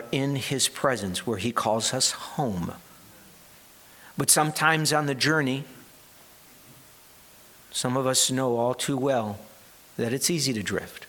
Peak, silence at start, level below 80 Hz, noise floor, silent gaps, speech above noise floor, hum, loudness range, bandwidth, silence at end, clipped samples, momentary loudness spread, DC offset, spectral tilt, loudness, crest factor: -4 dBFS; 0 s; -64 dBFS; -52 dBFS; none; 27 dB; none; 4 LU; 19 kHz; 0 s; under 0.1%; 12 LU; under 0.1%; -3 dB/octave; -25 LUFS; 24 dB